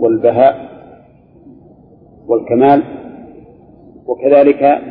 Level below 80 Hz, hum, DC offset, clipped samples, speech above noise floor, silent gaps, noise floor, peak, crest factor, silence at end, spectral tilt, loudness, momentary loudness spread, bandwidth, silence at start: -54 dBFS; none; under 0.1%; under 0.1%; 33 dB; none; -44 dBFS; 0 dBFS; 14 dB; 0 s; -11 dB/octave; -11 LUFS; 22 LU; 4.8 kHz; 0 s